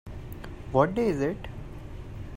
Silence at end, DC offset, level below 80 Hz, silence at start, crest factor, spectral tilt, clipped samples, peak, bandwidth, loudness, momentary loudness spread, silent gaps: 0 s; under 0.1%; -44 dBFS; 0.05 s; 22 dB; -8 dB/octave; under 0.1%; -6 dBFS; 16 kHz; -27 LUFS; 17 LU; none